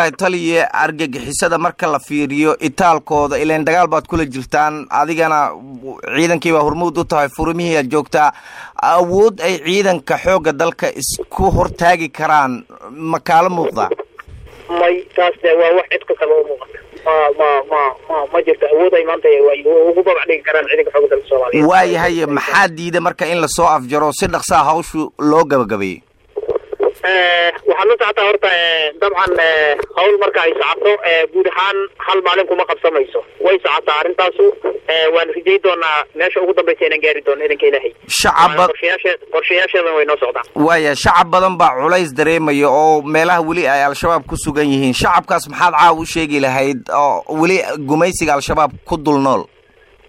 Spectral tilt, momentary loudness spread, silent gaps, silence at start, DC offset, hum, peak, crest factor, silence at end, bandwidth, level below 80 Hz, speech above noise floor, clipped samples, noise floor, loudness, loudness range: -4 dB/octave; 7 LU; none; 0 s; under 0.1%; none; -2 dBFS; 12 dB; 0.65 s; 16 kHz; -40 dBFS; 35 dB; under 0.1%; -48 dBFS; -14 LUFS; 3 LU